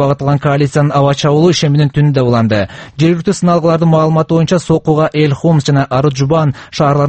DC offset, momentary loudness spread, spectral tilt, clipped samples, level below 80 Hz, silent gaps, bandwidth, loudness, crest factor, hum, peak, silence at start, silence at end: under 0.1%; 3 LU; -7 dB/octave; under 0.1%; -42 dBFS; none; 8.6 kHz; -11 LUFS; 10 dB; none; 0 dBFS; 0 s; 0 s